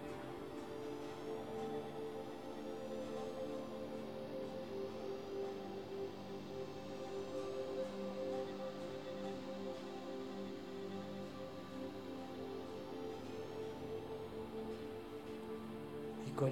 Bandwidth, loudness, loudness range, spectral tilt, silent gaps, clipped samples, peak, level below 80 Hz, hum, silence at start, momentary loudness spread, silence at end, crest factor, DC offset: 17.5 kHz; -46 LUFS; 2 LU; -6.5 dB/octave; none; under 0.1%; -24 dBFS; -72 dBFS; none; 0 s; 4 LU; 0 s; 20 dB; under 0.1%